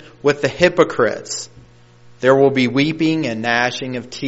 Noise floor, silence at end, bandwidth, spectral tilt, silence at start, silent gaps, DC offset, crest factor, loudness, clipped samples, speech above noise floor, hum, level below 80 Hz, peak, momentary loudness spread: -45 dBFS; 0 s; 8 kHz; -4 dB/octave; 0.25 s; none; 0.4%; 18 dB; -17 LUFS; under 0.1%; 29 dB; none; -52 dBFS; 0 dBFS; 13 LU